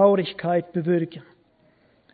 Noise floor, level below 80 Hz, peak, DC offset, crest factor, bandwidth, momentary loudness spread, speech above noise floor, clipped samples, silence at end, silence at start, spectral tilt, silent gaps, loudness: -61 dBFS; -68 dBFS; -4 dBFS; under 0.1%; 20 dB; 4.8 kHz; 11 LU; 39 dB; under 0.1%; 0.9 s; 0 s; -11.5 dB/octave; none; -24 LUFS